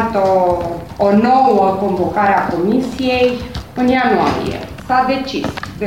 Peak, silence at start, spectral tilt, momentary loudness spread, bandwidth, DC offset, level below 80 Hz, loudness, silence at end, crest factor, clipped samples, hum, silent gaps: -2 dBFS; 0 s; -6.5 dB/octave; 11 LU; 16.5 kHz; 0.4%; -38 dBFS; -15 LUFS; 0 s; 12 dB; under 0.1%; none; none